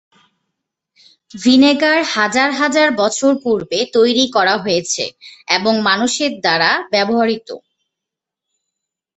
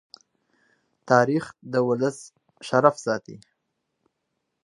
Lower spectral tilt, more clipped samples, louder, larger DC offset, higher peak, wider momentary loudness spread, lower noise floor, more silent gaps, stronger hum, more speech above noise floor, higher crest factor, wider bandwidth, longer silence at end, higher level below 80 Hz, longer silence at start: second, -3 dB/octave vs -6 dB/octave; neither; first, -14 LUFS vs -23 LUFS; neither; about the same, 0 dBFS vs -2 dBFS; second, 8 LU vs 11 LU; first, -83 dBFS vs -79 dBFS; neither; neither; first, 68 dB vs 56 dB; second, 16 dB vs 24 dB; second, 8.4 kHz vs 11.5 kHz; first, 1.6 s vs 1.3 s; first, -60 dBFS vs -72 dBFS; first, 1.35 s vs 1.05 s